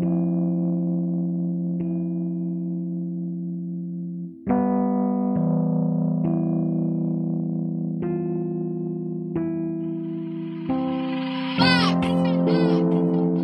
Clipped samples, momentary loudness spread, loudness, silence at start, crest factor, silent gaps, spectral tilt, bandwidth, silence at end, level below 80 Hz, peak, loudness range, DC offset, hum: under 0.1%; 10 LU; -24 LUFS; 0 s; 18 dB; none; -8 dB/octave; 9 kHz; 0 s; -58 dBFS; -4 dBFS; 5 LU; under 0.1%; none